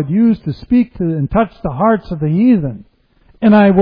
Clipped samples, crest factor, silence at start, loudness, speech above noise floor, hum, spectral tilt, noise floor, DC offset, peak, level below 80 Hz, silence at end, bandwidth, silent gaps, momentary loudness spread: under 0.1%; 14 dB; 0 s; -14 LUFS; 38 dB; none; -11 dB/octave; -50 dBFS; under 0.1%; 0 dBFS; -38 dBFS; 0 s; 5.2 kHz; none; 8 LU